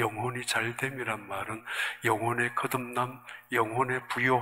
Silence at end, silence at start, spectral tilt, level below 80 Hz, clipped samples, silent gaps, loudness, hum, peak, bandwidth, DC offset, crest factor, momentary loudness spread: 0 s; 0 s; -4.5 dB/octave; -70 dBFS; under 0.1%; none; -30 LUFS; none; -10 dBFS; 16 kHz; under 0.1%; 20 dB; 7 LU